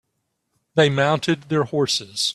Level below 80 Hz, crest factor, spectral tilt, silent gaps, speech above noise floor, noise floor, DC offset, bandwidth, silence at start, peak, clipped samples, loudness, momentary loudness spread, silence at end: -60 dBFS; 18 dB; -4.5 dB/octave; none; 55 dB; -75 dBFS; under 0.1%; 13 kHz; 0.75 s; -4 dBFS; under 0.1%; -20 LUFS; 5 LU; 0 s